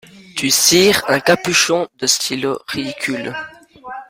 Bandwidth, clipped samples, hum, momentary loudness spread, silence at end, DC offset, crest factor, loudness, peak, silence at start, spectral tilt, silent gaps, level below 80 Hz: 16.5 kHz; under 0.1%; none; 17 LU; 0.05 s; under 0.1%; 18 dB; -15 LUFS; 0 dBFS; 0.15 s; -2 dB/octave; none; -54 dBFS